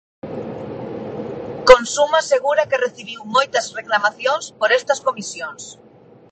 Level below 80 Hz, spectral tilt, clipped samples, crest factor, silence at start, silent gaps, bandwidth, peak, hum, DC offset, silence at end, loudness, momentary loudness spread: -48 dBFS; -2.5 dB/octave; under 0.1%; 20 dB; 0.25 s; none; 9 kHz; 0 dBFS; none; under 0.1%; 0.6 s; -18 LUFS; 18 LU